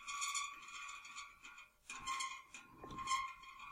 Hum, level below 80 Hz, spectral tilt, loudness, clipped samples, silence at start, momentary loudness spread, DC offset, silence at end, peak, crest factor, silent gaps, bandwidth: none; -70 dBFS; 0.5 dB/octave; -45 LUFS; under 0.1%; 0 s; 15 LU; under 0.1%; 0 s; -26 dBFS; 20 dB; none; 16 kHz